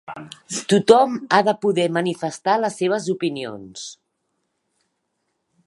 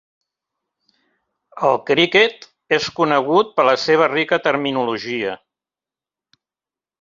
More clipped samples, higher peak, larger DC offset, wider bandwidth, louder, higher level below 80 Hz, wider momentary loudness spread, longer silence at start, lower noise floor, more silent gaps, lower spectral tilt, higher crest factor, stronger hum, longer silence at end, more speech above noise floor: neither; about the same, 0 dBFS vs 0 dBFS; neither; first, 11.5 kHz vs 7.6 kHz; second, -20 LUFS vs -17 LUFS; about the same, -68 dBFS vs -64 dBFS; first, 20 LU vs 8 LU; second, 0.1 s vs 1.55 s; second, -74 dBFS vs under -90 dBFS; neither; about the same, -4.5 dB/octave vs -4.5 dB/octave; about the same, 22 dB vs 18 dB; neither; about the same, 1.7 s vs 1.65 s; second, 54 dB vs over 73 dB